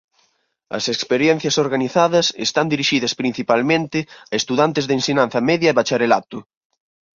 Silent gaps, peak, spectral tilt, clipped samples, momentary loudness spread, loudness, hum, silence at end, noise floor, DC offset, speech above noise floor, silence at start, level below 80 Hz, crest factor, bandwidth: none; 0 dBFS; -4 dB/octave; under 0.1%; 8 LU; -18 LUFS; none; 0.75 s; -65 dBFS; under 0.1%; 47 dB; 0.7 s; -60 dBFS; 18 dB; 7.6 kHz